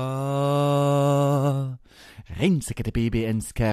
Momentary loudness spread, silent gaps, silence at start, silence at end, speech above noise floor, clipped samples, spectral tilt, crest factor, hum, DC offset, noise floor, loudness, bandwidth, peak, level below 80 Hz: 8 LU; none; 0 s; 0 s; 23 dB; under 0.1%; -7 dB/octave; 16 dB; none; under 0.1%; -47 dBFS; -23 LUFS; 14 kHz; -8 dBFS; -42 dBFS